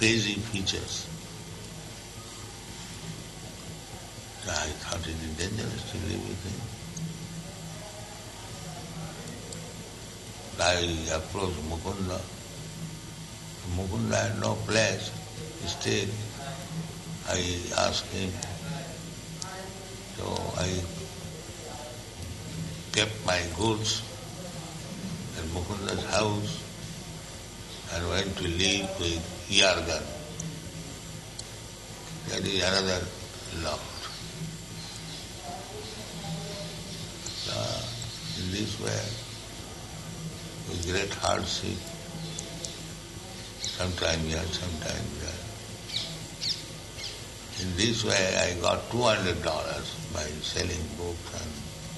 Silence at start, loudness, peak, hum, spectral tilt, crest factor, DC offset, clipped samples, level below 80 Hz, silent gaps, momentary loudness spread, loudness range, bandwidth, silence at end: 0 s; -32 LUFS; -6 dBFS; none; -3.5 dB/octave; 28 dB; under 0.1%; under 0.1%; -48 dBFS; none; 15 LU; 9 LU; 12 kHz; 0 s